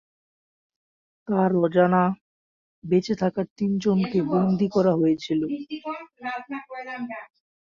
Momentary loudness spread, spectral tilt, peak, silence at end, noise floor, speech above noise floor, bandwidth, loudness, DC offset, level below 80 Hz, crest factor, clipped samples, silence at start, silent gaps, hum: 15 LU; -8 dB/octave; -6 dBFS; 0.5 s; under -90 dBFS; over 67 dB; 7.2 kHz; -24 LUFS; under 0.1%; -62 dBFS; 18 dB; under 0.1%; 1.3 s; 2.21-2.82 s, 3.51-3.56 s; none